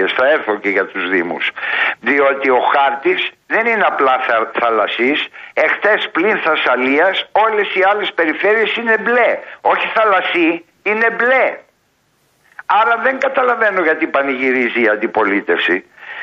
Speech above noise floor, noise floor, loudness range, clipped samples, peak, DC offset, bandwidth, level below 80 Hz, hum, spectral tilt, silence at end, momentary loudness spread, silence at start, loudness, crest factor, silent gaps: 45 dB; -60 dBFS; 2 LU; under 0.1%; -2 dBFS; under 0.1%; 7.2 kHz; -66 dBFS; none; -5 dB/octave; 0 s; 4 LU; 0 s; -14 LUFS; 14 dB; none